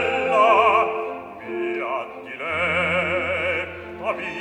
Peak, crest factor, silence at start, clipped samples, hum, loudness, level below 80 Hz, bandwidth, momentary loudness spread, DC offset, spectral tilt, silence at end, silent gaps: -4 dBFS; 18 dB; 0 s; under 0.1%; none; -21 LUFS; -54 dBFS; 10.5 kHz; 15 LU; under 0.1%; -5 dB/octave; 0 s; none